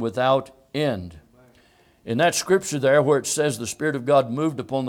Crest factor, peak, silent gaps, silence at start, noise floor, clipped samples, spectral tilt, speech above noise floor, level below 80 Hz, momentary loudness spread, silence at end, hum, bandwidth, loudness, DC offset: 18 dB; -6 dBFS; none; 0 s; -57 dBFS; under 0.1%; -4.5 dB/octave; 36 dB; -60 dBFS; 11 LU; 0 s; none; 17.5 kHz; -22 LUFS; under 0.1%